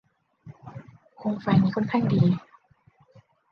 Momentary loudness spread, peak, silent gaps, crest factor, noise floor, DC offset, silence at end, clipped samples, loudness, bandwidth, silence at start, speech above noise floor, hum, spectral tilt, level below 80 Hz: 22 LU; -8 dBFS; none; 20 dB; -61 dBFS; under 0.1%; 1.1 s; under 0.1%; -24 LUFS; 6.2 kHz; 0.45 s; 39 dB; none; -9.5 dB/octave; -60 dBFS